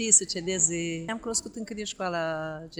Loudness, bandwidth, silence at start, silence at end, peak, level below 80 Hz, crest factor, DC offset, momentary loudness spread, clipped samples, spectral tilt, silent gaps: -27 LUFS; over 20 kHz; 0 s; 0 s; -6 dBFS; -58 dBFS; 24 dB; under 0.1%; 14 LU; under 0.1%; -2 dB/octave; none